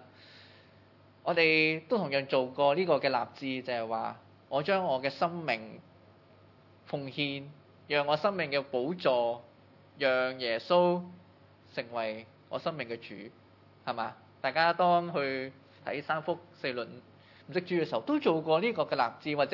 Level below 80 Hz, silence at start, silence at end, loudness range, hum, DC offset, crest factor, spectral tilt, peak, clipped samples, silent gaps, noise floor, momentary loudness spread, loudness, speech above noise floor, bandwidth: -84 dBFS; 0 s; 0 s; 6 LU; none; under 0.1%; 20 dB; -7 dB/octave; -10 dBFS; under 0.1%; none; -59 dBFS; 15 LU; -31 LUFS; 29 dB; 6 kHz